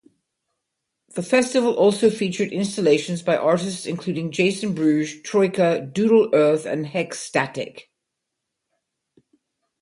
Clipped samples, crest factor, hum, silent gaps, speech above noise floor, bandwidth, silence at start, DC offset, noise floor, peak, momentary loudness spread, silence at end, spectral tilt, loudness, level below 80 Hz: under 0.1%; 18 dB; none; none; 60 dB; 11.5 kHz; 1.15 s; under 0.1%; -81 dBFS; -4 dBFS; 10 LU; 2 s; -5.5 dB/octave; -21 LUFS; -66 dBFS